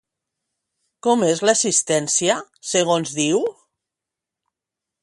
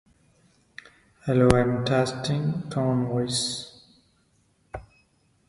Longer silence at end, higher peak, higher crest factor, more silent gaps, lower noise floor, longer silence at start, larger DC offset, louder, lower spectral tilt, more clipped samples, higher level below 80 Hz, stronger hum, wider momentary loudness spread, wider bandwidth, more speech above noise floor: first, 1.5 s vs 0.65 s; second, -4 dBFS vs 0 dBFS; second, 18 dB vs 26 dB; neither; first, -86 dBFS vs -66 dBFS; second, 1.05 s vs 1.25 s; neither; first, -19 LUFS vs -24 LUFS; second, -3 dB/octave vs -5.5 dB/octave; neither; second, -68 dBFS vs -48 dBFS; neither; second, 6 LU vs 25 LU; about the same, 11.5 kHz vs 11.5 kHz; first, 67 dB vs 42 dB